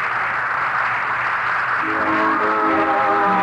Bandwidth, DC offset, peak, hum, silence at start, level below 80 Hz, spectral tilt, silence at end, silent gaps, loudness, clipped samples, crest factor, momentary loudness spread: 11.5 kHz; under 0.1%; -8 dBFS; none; 0 s; -56 dBFS; -5.5 dB/octave; 0 s; none; -18 LUFS; under 0.1%; 12 dB; 3 LU